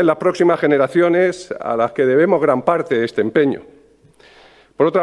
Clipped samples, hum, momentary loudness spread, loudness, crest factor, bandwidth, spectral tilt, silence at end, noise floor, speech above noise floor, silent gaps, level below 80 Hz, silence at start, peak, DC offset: under 0.1%; none; 6 LU; -16 LUFS; 16 dB; 11 kHz; -7 dB/octave; 0 s; -49 dBFS; 34 dB; none; -62 dBFS; 0 s; 0 dBFS; under 0.1%